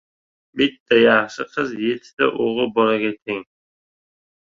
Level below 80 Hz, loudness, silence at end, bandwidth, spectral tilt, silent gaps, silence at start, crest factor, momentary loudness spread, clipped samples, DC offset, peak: -62 dBFS; -19 LUFS; 1 s; 7.4 kHz; -5 dB/octave; 0.80-0.86 s, 2.13-2.17 s, 3.22-3.26 s; 0.55 s; 18 dB; 13 LU; under 0.1%; under 0.1%; -2 dBFS